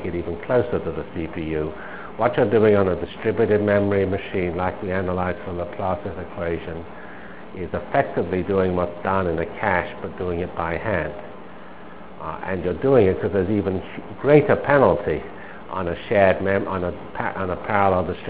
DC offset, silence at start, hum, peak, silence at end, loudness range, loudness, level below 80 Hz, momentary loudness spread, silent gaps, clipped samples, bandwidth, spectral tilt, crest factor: 1%; 0 s; none; 0 dBFS; 0 s; 7 LU; -22 LUFS; -42 dBFS; 18 LU; none; under 0.1%; 4 kHz; -11 dB/octave; 22 dB